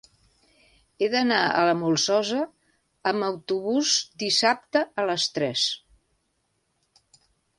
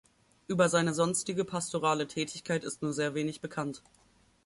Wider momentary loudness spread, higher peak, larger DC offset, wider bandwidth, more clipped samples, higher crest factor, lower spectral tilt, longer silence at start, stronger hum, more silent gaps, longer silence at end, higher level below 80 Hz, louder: second, 7 LU vs 10 LU; first, -6 dBFS vs -12 dBFS; neither; about the same, 11.5 kHz vs 11.5 kHz; neither; about the same, 20 dB vs 20 dB; second, -2.5 dB/octave vs -4.5 dB/octave; first, 1 s vs 0.5 s; neither; neither; first, 1.8 s vs 0.65 s; about the same, -68 dBFS vs -70 dBFS; first, -24 LUFS vs -31 LUFS